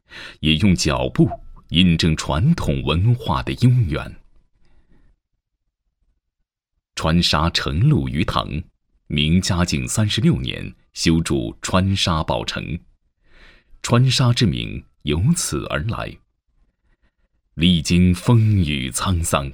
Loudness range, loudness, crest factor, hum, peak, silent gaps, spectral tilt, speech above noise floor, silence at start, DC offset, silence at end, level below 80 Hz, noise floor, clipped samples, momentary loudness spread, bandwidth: 5 LU; -19 LUFS; 20 dB; none; 0 dBFS; none; -5 dB/octave; 59 dB; 0.1 s; under 0.1%; 0 s; -34 dBFS; -77 dBFS; under 0.1%; 13 LU; 18 kHz